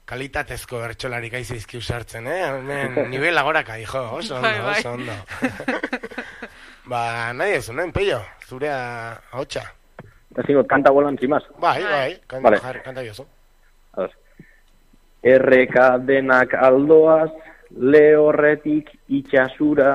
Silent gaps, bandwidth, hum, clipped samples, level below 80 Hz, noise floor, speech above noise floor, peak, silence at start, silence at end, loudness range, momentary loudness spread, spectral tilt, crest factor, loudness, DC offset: none; 14 kHz; none; under 0.1%; -48 dBFS; -53 dBFS; 35 dB; -2 dBFS; 0.1 s; 0 s; 10 LU; 18 LU; -6 dB/octave; 18 dB; -19 LUFS; under 0.1%